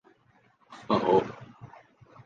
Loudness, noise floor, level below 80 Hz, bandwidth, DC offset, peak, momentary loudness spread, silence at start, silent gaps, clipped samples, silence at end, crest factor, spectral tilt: -27 LUFS; -64 dBFS; -64 dBFS; 7.4 kHz; under 0.1%; -10 dBFS; 25 LU; 0.7 s; none; under 0.1%; 0.6 s; 22 dB; -7 dB/octave